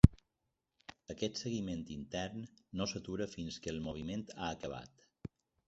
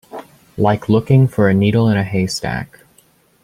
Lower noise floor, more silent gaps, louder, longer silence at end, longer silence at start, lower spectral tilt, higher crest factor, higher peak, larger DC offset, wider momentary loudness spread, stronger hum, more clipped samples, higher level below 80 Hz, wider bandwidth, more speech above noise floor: first, -86 dBFS vs -54 dBFS; neither; second, -40 LUFS vs -15 LUFS; second, 0.4 s vs 0.8 s; about the same, 0.05 s vs 0.15 s; about the same, -6.5 dB/octave vs -7 dB/octave; first, 32 dB vs 14 dB; about the same, -4 dBFS vs -2 dBFS; neither; second, 13 LU vs 22 LU; neither; neither; about the same, -46 dBFS vs -46 dBFS; second, 8 kHz vs 14.5 kHz; first, 45 dB vs 39 dB